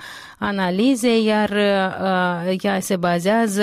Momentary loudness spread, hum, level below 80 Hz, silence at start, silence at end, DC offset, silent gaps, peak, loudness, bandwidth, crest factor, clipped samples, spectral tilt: 5 LU; none; -60 dBFS; 0 s; 0 s; under 0.1%; none; -8 dBFS; -19 LUFS; 16 kHz; 12 dB; under 0.1%; -5 dB/octave